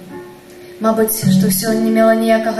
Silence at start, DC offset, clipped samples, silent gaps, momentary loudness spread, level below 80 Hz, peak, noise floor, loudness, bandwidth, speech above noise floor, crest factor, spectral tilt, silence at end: 0 s; under 0.1%; under 0.1%; none; 10 LU; -52 dBFS; -2 dBFS; -37 dBFS; -14 LUFS; 14.5 kHz; 23 dB; 12 dB; -5.5 dB/octave; 0 s